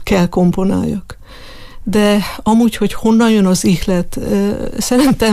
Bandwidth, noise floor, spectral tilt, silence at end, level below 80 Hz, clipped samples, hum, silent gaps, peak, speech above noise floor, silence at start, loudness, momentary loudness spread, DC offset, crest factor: 15.5 kHz; -33 dBFS; -5.5 dB/octave; 0 s; -32 dBFS; under 0.1%; none; none; -2 dBFS; 20 dB; 0 s; -14 LUFS; 7 LU; under 0.1%; 12 dB